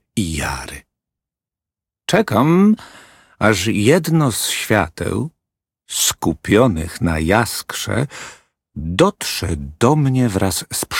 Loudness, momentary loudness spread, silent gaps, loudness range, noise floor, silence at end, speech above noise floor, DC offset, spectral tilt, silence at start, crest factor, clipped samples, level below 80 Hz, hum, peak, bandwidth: -17 LUFS; 12 LU; none; 3 LU; -88 dBFS; 0 s; 71 dB; under 0.1%; -4.5 dB/octave; 0.15 s; 18 dB; under 0.1%; -38 dBFS; none; 0 dBFS; 17 kHz